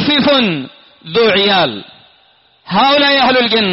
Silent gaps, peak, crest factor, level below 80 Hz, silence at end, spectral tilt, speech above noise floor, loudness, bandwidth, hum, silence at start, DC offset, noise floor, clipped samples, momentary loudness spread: none; -2 dBFS; 10 dB; -50 dBFS; 0 s; -1.5 dB/octave; 39 dB; -11 LUFS; 6 kHz; none; 0 s; under 0.1%; -51 dBFS; under 0.1%; 11 LU